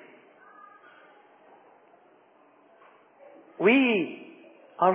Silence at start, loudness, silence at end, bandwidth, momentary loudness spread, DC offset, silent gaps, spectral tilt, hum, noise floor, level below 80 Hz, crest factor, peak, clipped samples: 3.6 s; -24 LUFS; 0 s; 3.8 kHz; 29 LU; under 0.1%; none; -3 dB/octave; none; -59 dBFS; under -90 dBFS; 22 dB; -8 dBFS; under 0.1%